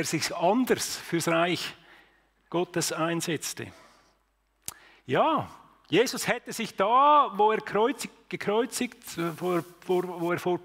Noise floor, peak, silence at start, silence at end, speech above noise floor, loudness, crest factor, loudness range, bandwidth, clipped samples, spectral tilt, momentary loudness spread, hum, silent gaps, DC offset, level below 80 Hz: -71 dBFS; -10 dBFS; 0 s; 0 s; 44 dB; -27 LUFS; 18 dB; 7 LU; 16 kHz; under 0.1%; -4 dB/octave; 14 LU; none; none; under 0.1%; -68 dBFS